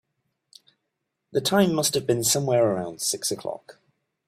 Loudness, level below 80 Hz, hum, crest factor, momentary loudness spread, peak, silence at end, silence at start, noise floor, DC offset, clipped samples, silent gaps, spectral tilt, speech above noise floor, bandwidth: -23 LUFS; -64 dBFS; none; 20 dB; 10 LU; -6 dBFS; 0.55 s; 1.35 s; -80 dBFS; under 0.1%; under 0.1%; none; -3.5 dB/octave; 56 dB; 16 kHz